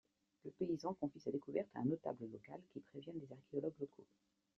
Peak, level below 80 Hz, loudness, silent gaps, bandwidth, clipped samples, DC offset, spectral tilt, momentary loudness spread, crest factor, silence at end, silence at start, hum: -26 dBFS; -82 dBFS; -46 LUFS; none; 7.6 kHz; under 0.1%; under 0.1%; -8 dB/octave; 13 LU; 20 dB; 0.55 s; 0.45 s; none